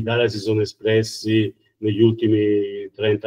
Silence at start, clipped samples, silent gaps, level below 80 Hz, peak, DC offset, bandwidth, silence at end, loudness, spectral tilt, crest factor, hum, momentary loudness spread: 0 s; under 0.1%; none; -60 dBFS; -4 dBFS; under 0.1%; 12.5 kHz; 0 s; -20 LUFS; -6.5 dB/octave; 16 dB; none; 8 LU